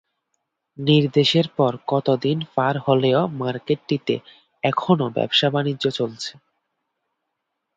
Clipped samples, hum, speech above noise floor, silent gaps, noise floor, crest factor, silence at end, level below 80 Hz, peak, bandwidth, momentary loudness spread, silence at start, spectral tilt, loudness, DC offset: under 0.1%; none; 58 dB; none; -78 dBFS; 18 dB; 1.45 s; -64 dBFS; -4 dBFS; 8 kHz; 9 LU; 0.8 s; -6.5 dB/octave; -21 LUFS; under 0.1%